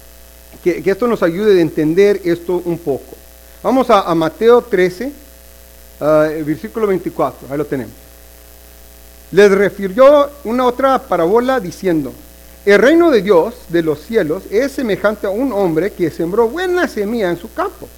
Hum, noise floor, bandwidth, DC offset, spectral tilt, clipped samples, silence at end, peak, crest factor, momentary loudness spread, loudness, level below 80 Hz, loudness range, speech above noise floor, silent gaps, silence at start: 60 Hz at -40 dBFS; -40 dBFS; 18.5 kHz; under 0.1%; -6 dB/octave; 0.2%; 0.1 s; 0 dBFS; 14 dB; 10 LU; -14 LUFS; -42 dBFS; 6 LU; 26 dB; none; 0.55 s